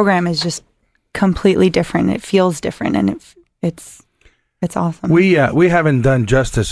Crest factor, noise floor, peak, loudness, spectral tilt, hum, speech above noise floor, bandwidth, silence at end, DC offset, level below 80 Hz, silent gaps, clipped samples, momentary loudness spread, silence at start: 14 dB; -54 dBFS; 0 dBFS; -15 LUFS; -6 dB/octave; none; 40 dB; 11 kHz; 0 s; under 0.1%; -36 dBFS; none; under 0.1%; 11 LU; 0 s